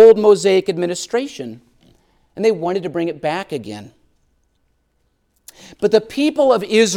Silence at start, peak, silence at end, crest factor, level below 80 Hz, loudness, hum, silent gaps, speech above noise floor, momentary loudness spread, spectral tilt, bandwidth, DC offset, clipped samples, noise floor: 0 s; 0 dBFS; 0 s; 16 dB; -60 dBFS; -17 LUFS; none; none; 48 dB; 18 LU; -4.5 dB/octave; 12.5 kHz; under 0.1%; under 0.1%; -65 dBFS